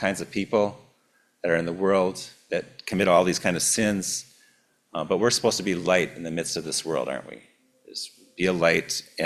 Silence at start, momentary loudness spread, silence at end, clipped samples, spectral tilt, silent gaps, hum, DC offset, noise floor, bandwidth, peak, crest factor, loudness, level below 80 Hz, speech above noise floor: 0 s; 14 LU; 0 s; under 0.1%; -3.5 dB/octave; none; none; under 0.1%; -66 dBFS; 15 kHz; -6 dBFS; 20 dB; -25 LUFS; -58 dBFS; 41 dB